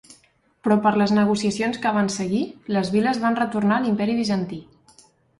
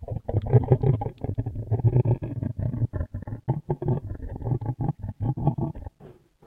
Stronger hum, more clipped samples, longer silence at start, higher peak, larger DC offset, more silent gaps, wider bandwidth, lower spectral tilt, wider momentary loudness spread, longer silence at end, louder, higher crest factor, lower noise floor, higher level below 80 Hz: neither; neither; first, 0.65 s vs 0 s; about the same, -6 dBFS vs -6 dBFS; neither; neither; first, 11.5 kHz vs 3.5 kHz; second, -5.5 dB/octave vs -12 dB/octave; second, 7 LU vs 11 LU; first, 0.75 s vs 0.35 s; first, -22 LUFS vs -27 LUFS; about the same, 16 dB vs 20 dB; first, -60 dBFS vs -50 dBFS; second, -60 dBFS vs -40 dBFS